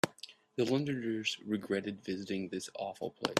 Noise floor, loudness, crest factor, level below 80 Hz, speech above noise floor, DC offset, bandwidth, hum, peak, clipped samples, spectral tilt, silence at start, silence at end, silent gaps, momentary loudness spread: -55 dBFS; -36 LUFS; 24 dB; -74 dBFS; 19 dB; under 0.1%; 14 kHz; none; -12 dBFS; under 0.1%; -4.5 dB/octave; 0.05 s; 0 s; none; 8 LU